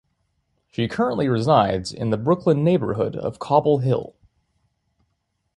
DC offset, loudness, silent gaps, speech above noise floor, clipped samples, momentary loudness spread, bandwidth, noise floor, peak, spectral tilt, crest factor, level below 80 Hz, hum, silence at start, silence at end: under 0.1%; -21 LUFS; none; 53 dB; under 0.1%; 9 LU; 11.5 kHz; -73 dBFS; -2 dBFS; -7.5 dB/octave; 20 dB; -52 dBFS; none; 0.8 s; 1.5 s